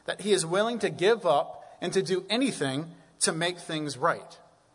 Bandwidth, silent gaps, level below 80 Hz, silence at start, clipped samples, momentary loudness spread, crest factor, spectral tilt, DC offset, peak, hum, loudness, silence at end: 11 kHz; none; -74 dBFS; 0.1 s; under 0.1%; 11 LU; 18 dB; -3.5 dB/octave; under 0.1%; -12 dBFS; none; -28 LUFS; 0.4 s